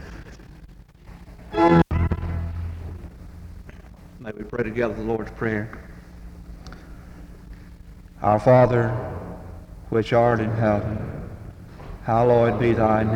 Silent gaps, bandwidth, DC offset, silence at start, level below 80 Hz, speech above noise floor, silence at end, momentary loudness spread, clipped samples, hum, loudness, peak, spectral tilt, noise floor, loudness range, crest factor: none; 9.4 kHz; under 0.1%; 0 s; -40 dBFS; 25 dB; 0 s; 26 LU; under 0.1%; none; -22 LUFS; -4 dBFS; -8.5 dB/octave; -45 dBFS; 9 LU; 20 dB